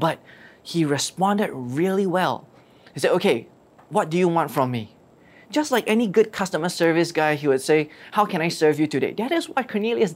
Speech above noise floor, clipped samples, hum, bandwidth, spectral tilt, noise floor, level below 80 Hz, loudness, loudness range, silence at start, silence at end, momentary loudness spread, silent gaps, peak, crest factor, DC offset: 30 dB; under 0.1%; none; 16 kHz; -5 dB/octave; -51 dBFS; -68 dBFS; -22 LUFS; 3 LU; 0 s; 0 s; 7 LU; none; -6 dBFS; 16 dB; under 0.1%